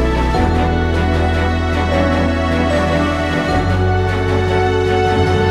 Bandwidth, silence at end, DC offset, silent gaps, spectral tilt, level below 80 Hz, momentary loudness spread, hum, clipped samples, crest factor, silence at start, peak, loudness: 11 kHz; 0 s; under 0.1%; none; -7 dB/octave; -22 dBFS; 2 LU; none; under 0.1%; 12 dB; 0 s; -2 dBFS; -16 LUFS